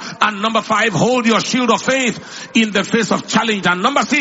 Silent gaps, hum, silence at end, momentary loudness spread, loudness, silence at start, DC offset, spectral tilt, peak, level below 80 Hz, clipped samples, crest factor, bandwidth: none; none; 0 s; 3 LU; -15 LUFS; 0 s; under 0.1%; -3.5 dB/octave; 0 dBFS; -56 dBFS; under 0.1%; 16 dB; 8 kHz